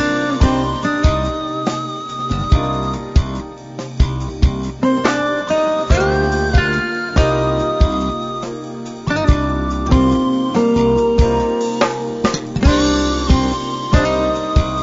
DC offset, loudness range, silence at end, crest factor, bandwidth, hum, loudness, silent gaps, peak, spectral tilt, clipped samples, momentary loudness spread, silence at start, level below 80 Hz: under 0.1%; 4 LU; 0 s; 16 dB; 7.8 kHz; none; -17 LUFS; none; 0 dBFS; -6 dB/octave; under 0.1%; 8 LU; 0 s; -22 dBFS